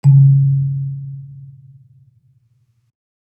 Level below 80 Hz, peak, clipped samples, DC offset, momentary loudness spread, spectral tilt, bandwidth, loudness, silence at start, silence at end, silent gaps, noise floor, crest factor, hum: -66 dBFS; -2 dBFS; under 0.1%; under 0.1%; 26 LU; -11.5 dB/octave; 1 kHz; -14 LUFS; 0.05 s; 1.9 s; none; -59 dBFS; 14 dB; none